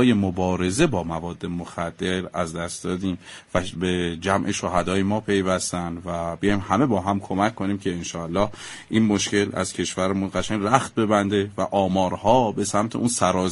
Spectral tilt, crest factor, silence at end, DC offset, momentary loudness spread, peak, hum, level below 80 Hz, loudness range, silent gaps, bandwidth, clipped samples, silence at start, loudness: -5 dB/octave; 22 dB; 0 s; under 0.1%; 9 LU; 0 dBFS; none; -46 dBFS; 4 LU; none; 11.5 kHz; under 0.1%; 0 s; -23 LUFS